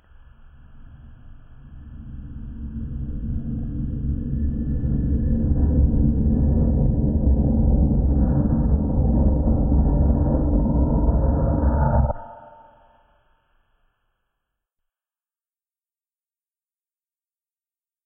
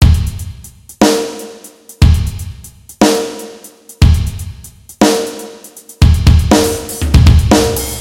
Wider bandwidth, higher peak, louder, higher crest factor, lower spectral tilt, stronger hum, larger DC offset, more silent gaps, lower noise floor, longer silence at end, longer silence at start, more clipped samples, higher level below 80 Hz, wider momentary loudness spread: second, 1.9 kHz vs 16.5 kHz; second, -6 dBFS vs 0 dBFS; second, -21 LUFS vs -12 LUFS; about the same, 16 dB vs 12 dB; first, -15 dB/octave vs -5.5 dB/octave; neither; neither; neither; first, under -90 dBFS vs -36 dBFS; first, 5.6 s vs 0 s; first, 0.45 s vs 0 s; second, under 0.1% vs 1%; second, -24 dBFS vs -16 dBFS; second, 14 LU vs 22 LU